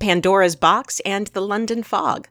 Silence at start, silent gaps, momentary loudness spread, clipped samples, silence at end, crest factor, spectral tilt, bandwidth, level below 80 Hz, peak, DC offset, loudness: 0 s; none; 8 LU; under 0.1%; 0.1 s; 18 dB; -4 dB/octave; 19.5 kHz; -54 dBFS; -2 dBFS; under 0.1%; -19 LUFS